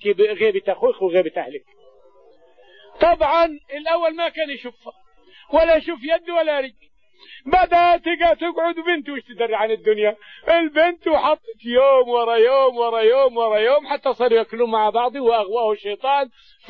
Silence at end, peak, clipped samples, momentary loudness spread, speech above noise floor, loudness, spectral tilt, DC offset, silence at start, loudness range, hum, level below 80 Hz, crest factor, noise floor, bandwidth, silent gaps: 0.4 s; -4 dBFS; under 0.1%; 10 LU; 34 dB; -19 LUFS; -6 dB/octave; 0.2%; 0 s; 5 LU; none; -48 dBFS; 14 dB; -53 dBFS; 5.6 kHz; none